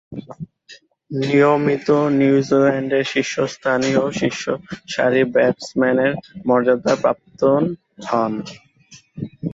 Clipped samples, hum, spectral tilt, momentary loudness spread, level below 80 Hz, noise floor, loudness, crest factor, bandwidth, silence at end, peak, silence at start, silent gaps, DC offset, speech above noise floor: under 0.1%; none; -6 dB/octave; 16 LU; -58 dBFS; -49 dBFS; -18 LUFS; 16 dB; 8 kHz; 0 s; -4 dBFS; 0.1 s; none; under 0.1%; 31 dB